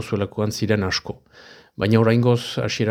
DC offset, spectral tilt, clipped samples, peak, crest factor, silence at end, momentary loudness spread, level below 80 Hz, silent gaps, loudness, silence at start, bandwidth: under 0.1%; -6 dB/octave; under 0.1%; -2 dBFS; 18 dB; 0 s; 17 LU; -52 dBFS; none; -21 LUFS; 0 s; 15.5 kHz